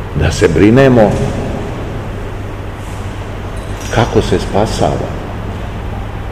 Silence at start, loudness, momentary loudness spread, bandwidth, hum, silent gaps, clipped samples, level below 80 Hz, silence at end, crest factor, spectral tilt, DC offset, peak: 0 s; -14 LUFS; 16 LU; 15.5 kHz; none; none; 0.8%; -24 dBFS; 0 s; 14 dB; -6.5 dB/octave; 0.9%; 0 dBFS